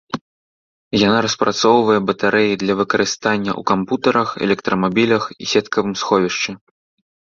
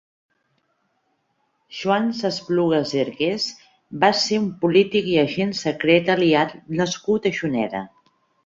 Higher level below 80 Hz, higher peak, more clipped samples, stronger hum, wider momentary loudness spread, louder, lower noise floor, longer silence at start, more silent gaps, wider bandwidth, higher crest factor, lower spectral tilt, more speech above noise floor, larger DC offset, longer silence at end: first, -54 dBFS vs -62 dBFS; about the same, 0 dBFS vs -2 dBFS; neither; neither; second, 6 LU vs 10 LU; first, -17 LUFS vs -21 LUFS; first, under -90 dBFS vs -70 dBFS; second, 0.15 s vs 1.7 s; first, 0.21-0.91 s vs none; about the same, 7.6 kHz vs 7.8 kHz; about the same, 16 dB vs 20 dB; about the same, -4.5 dB/octave vs -5 dB/octave; first, over 73 dB vs 49 dB; neither; first, 0.85 s vs 0.6 s